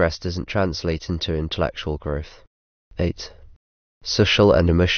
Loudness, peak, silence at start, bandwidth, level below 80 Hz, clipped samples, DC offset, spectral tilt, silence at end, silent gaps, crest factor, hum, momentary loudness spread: -21 LUFS; -4 dBFS; 0 s; 6.6 kHz; -36 dBFS; under 0.1%; under 0.1%; -5.5 dB/octave; 0 s; 2.47-2.91 s, 3.56-4.01 s; 18 dB; none; 19 LU